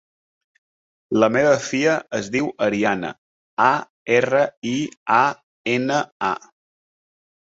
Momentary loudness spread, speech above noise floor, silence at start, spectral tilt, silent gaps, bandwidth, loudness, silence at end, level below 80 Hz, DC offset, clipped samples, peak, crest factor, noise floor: 8 LU; over 70 dB; 1.1 s; -5 dB/octave; 3.18-3.57 s, 3.90-4.06 s, 4.57-4.62 s, 4.97-5.06 s, 5.43-5.64 s, 6.12-6.20 s; 8 kHz; -20 LUFS; 1.1 s; -62 dBFS; under 0.1%; under 0.1%; -2 dBFS; 20 dB; under -90 dBFS